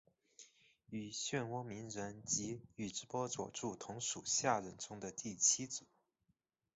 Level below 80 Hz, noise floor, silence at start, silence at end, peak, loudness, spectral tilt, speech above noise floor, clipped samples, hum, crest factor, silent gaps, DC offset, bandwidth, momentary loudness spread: -76 dBFS; -83 dBFS; 0.4 s; 0.9 s; -20 dBFS; -40 LUFS; -2.5 dB/octave; 42 dB; under 0.1%; none; 24 dB; none; under 0.1%; 8.2 kHz; 14 LU